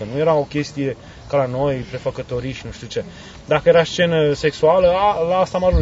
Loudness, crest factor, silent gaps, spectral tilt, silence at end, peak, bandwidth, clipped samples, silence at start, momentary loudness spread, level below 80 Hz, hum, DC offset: -18 LUFS; 18 dB; none; -6 dB/octave; 0 s; 0 dBFS; 8 kHz; under 0.1%; 0 s; 14 LU; -34 dBFS; none; under 0.1%